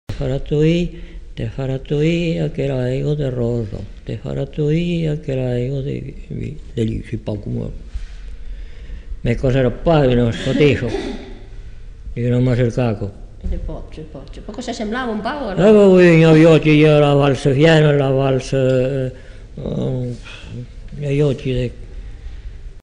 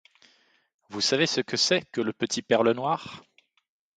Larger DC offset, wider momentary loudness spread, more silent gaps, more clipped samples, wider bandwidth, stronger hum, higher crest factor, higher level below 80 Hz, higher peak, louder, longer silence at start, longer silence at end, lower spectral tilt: neither; first, 23 LU vs 13 LU; neither; neither; about the same, 10 kHz vs 9.4 kHz; neither; second, 14 dB vs 20 dB; first, -32 dBFS vs -70 dBFS; first, -2 dBFS vs -8 dBFS; first, -17 LUFS vs -25 LUFS; second, 0.1 s vs 0.9 s; second, 0.05 s vs 0.8 s; first, -7.5 dB/octave vs -3 dB/octave